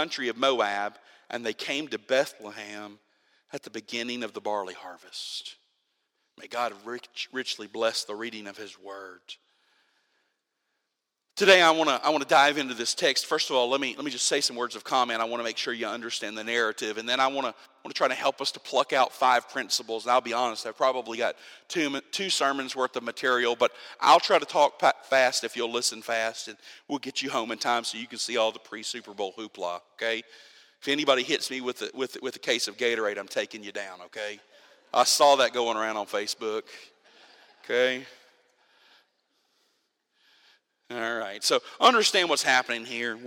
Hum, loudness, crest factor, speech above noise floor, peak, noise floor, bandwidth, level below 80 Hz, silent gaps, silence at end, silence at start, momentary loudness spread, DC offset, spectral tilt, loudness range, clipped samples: none; -26 LUFS; 26 dB; 55 dB; -2 dBFS; -82 dBFS; 16.5 kHz; -82 dBFS; none; 0 s; 0 s; 17 LU; under 0.1%; -1.5 dB/octave; 11 LU; under 0.1%